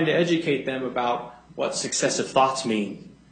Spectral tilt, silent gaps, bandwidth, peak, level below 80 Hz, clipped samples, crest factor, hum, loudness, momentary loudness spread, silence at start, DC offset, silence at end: -3.5 dB/octave; none; 9.4 kHz; -4 dBFS; -62 dBFS; under 0.1%; 20 dB; none; -24 LUFS; 10 LU; 0 s; under 0.1%; 0.15 s